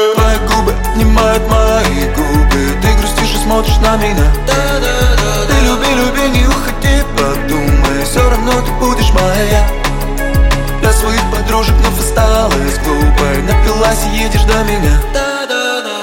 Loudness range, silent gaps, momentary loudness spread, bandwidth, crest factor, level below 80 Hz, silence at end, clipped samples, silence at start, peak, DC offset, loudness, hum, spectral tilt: 1 LU; none; 3 LU; 17 kHz; 10 dB; -14 dBFS; 0 s; under 0.1%; 0 s; 0 dBFS; under 0.1%; -12 LUFS; none; -4.5 dB/octave